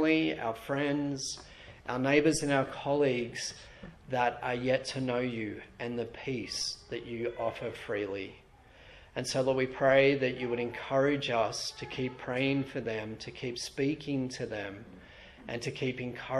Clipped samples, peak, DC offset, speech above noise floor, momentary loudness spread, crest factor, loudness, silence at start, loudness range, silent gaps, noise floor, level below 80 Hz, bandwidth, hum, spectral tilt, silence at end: under 0.1%; -10 dBFS; under 0.1%; 24 dB; 14 LU; 22 dB; -32 LUFS; 0 s; 7 LU; none; -56 dBFS; -60 dBFS; 13.5 kHz; none; -4.5 dB/octave; 0 s